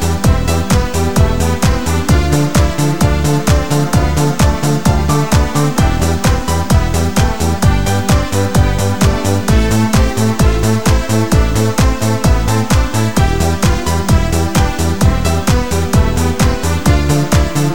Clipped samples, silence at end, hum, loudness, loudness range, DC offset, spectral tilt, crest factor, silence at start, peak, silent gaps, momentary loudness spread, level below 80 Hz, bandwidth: under 0.1%; 0 s; none; -13 LUFS; 1 LU; 6%; -5.5 dB/octave; 12 dB; 0 s; 0 dBFS; none; 2 LU; -18 dBFS; 17.5 kHz